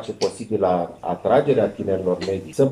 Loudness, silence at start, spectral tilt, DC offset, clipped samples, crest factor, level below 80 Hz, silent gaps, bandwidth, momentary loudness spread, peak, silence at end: -22 LUFS; 0 s; -6.5 dB/octave; under 0.1%; under 0.1%; 16 dB; -60 dBFS; none; 12 kHz; 8 LU; -4 dBFS; 0 s